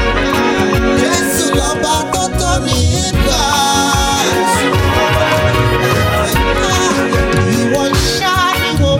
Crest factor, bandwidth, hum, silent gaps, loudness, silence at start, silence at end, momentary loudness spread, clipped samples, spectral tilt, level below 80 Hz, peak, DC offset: 12 dB; 17 kHz; none; none; -13 LUFS; 0 s; 0 s; 2 LU; under 0.1%; -4 dB/octave; -22 dBFS; 0 dBFS; under 0.1%